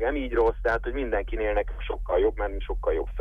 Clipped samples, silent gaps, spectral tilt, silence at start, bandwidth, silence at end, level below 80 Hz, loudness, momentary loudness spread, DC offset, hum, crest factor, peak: under 0.1%; none; -8 dB/octave; 0 s; 5.2 kHz; 0 s; -32 dBFS; -27 LUFS; 7 LU; under 0.1%; none; 14 dB; -12 dBFS